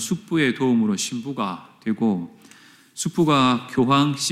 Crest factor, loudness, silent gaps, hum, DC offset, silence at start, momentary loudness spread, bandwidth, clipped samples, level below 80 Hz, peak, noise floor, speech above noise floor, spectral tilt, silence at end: 16 dB; -21 LUFS; none; none; under 0.1%; 0 s; 11 LU; 15.5 kHz; under 0.1%; -64 dBFS; -6 dBFS; -50 dBFS; 29 dB; -4.5 dB/octave; 0 s